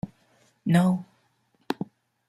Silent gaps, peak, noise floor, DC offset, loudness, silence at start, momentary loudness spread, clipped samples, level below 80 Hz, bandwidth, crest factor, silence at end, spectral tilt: none; -6 dBFS; -68 dBFS; under 0.1%; -26 LUFS; 0.05 s; 17 LU; under 0.1%; -64 dBFS; 13 kHz; 22 dB; 0.45 s; -7.5 dB/octave